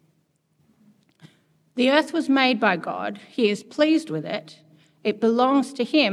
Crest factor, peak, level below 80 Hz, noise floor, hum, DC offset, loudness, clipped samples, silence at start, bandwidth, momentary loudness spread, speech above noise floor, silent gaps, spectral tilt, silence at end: 20 dB; -4 dBFS; -82 dBFS; -67 dBFS; none; under 0.1%; -22 LUFS; under 0.1%; 1.75 s; 12 kHz; 11 LU; 46 dB; none; -5 dB/octave; 0 s